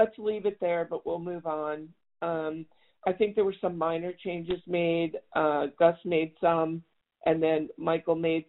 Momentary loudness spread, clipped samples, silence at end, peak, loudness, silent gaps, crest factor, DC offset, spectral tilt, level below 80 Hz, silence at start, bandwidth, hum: 9 LU; under 0.1%; 0.05 s; -10 dBFS; -29 LUFS; none; 20 dB; under 0.1%; -5 dB/octave; -64 dBFS; 0 s; 4.1 kHz; none